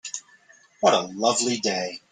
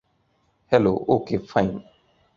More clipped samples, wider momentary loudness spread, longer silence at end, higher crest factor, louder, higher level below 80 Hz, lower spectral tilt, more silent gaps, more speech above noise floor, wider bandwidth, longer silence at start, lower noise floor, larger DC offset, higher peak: neither; first, 12 LU vs 7 LU; second, 0.15 s vs 0.55 s; about the same, 20 dB vs 22 dB; about the same, -23 LUFS vs -22 LUFS; second, -70 dBFS vs -52 dBFS; second, -2.5 dB/octave vs -8 dB/octave; neither; second, 33 dB vs 45 dB; first, 10 kHz vs 7.2 kHz; second, 0.05 s vs 0.7 s; second, -56 dBFS vs -67 dBFS; neither; about the same, -4 dBFS vs -2 dBFS